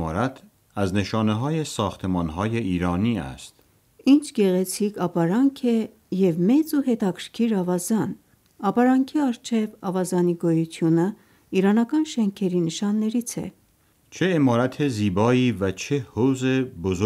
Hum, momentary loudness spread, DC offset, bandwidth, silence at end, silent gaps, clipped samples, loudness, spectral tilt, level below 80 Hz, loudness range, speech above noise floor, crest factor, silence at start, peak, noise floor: none; 8 LU; under 0.1%; 16 kHz; 0 s; none; under 0.1%; -23 LUFS; -6.5 dB/octave; -56 dBFS; 2 LU; 39 dB; 16 dB; 0 s; -6 dBFS; -61 dBFS